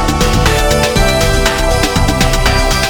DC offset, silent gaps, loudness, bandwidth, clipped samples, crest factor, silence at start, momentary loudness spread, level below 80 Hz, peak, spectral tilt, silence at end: under 0.1%; none; -12 LUFS; 19.5 kHz; under 0.1%; 10 dB; 0 s; 1 LU; -16 dBFS; 0 dBFS; -4 dB/octave; 0 s